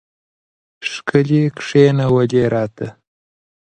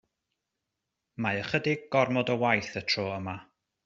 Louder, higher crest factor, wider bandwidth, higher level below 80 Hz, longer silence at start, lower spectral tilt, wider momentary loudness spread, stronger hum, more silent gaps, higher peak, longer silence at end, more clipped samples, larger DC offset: first, -16 LUFS vs -28 LUFS; about the same, 18 dB vs 22 dB; first, 9.4 kHz vs 7.8 kHz; first, -52 dBFS vs -68 dBFS; second, 0.8 s vs 1.2 s; first, -7 dB/octave vs -3.5 dB/octave; about the same, 14 LU vs 12 LU; neither; neither; first, 0 dBFS vs -8 dBFS; first, 0.8 s vs 0.45 s; neither; neither